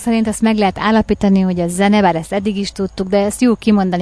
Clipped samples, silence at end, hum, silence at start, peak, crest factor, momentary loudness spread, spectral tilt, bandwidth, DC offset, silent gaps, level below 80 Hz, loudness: under 0.1%; 0 s; none; 0 s; -2 dBFS; 12 dB; 7 LU; -6 dB/octave; 11 kHz; 0.2%; none; -38 dBFS; -15 LUFS